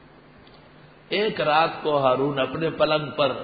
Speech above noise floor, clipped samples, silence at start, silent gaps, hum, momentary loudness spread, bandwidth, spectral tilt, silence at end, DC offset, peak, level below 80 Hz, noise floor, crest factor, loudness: 27 dB; under 0.1%; 1.1 s; none; none; 5 LU; 5 kHz; -10 dB/octave; 0 s; under 0.1%; -6 dBFS; -58 dBFS; -50 dBFS; 18 dB; -23 LUFS